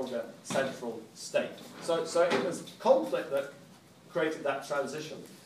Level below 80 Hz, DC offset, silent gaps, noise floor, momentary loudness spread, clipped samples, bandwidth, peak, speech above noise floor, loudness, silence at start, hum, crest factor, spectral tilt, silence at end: -82 dBFS; under 0.1%; none; -55 dBFS; 13 LU; under 0.1%; 15.5 kHz; -12 dBFS; 23 dB; -32 LUFS; 0 s; none; 20 dB; -4 dB/octave; 0 s